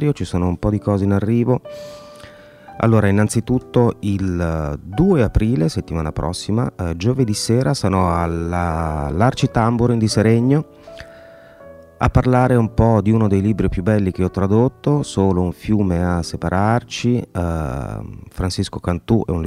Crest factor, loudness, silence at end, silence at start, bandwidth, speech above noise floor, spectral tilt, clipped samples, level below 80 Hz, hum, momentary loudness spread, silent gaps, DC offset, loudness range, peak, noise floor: 18 dB; -18 LUFS; 0 s; 0 s; 14 kHz; 25 dB; -7 dB/octave; under 0.1%; -34 dBFS; none; 9 LU; none; under 0.1%; 3 LU; 0 dBFS; -42 dBFS